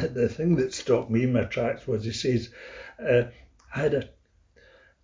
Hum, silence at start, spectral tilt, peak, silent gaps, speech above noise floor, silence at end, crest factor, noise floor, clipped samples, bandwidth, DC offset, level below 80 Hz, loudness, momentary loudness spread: none; 0 s; -6.5 dB/octave; -10 dBFS; none; 34 dB; 0.95 s; 18 dB; -60 dBFS; under 0.1%; 7.6 kHz; under 0.1%; -52 dBFS; -26 LUFS; 13 LU